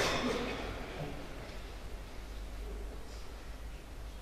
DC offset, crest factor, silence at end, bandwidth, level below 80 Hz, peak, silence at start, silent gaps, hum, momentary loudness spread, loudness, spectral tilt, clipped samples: under 0.1%; 22 dB; 0 s; 15 kHz; -46 dBFS; -18 dBFS; 0 s; none; none; 13 LU; -42 LUFS; -4 dB/octave; under 0.1%